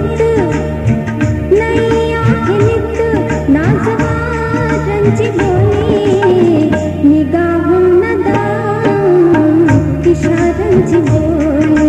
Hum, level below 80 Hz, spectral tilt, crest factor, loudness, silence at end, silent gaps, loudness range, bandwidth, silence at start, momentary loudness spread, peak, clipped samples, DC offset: none; -26 dBFS; -8 dB/octave; 10 dB; -11 LUFS; 0 s; none; 2 LU; 10.5 kHz; 0 s; 5 LU; 0 dBFS; under 0.1%; under 0.1%